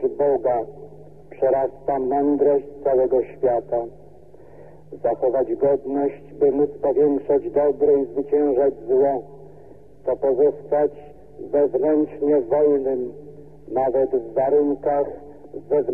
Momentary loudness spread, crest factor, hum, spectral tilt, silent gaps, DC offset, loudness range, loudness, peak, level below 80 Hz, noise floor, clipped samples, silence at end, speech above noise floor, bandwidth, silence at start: 9 LU; 12 dB; none; -10.5 dB/octave; none; 0.5%; 3 LU; -21 LUFS; -8 dBFS; -56 dBFS; -47 dBFS; under 0.1%; 0 s; 26 dB; 2.8 kHz; 0 s